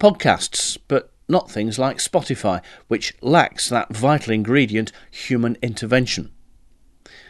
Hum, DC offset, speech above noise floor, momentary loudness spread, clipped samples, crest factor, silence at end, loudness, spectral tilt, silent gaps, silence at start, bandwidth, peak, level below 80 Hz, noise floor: none; under 0.1%; 32 dB; 9 LU; under 0.1%; 20 dB; 1 s; -20 LUFS; -4.5 dB/octave; none; 0 s; 12.5 kHz; 0 dBFS; -50 dBFS; -51 dBFS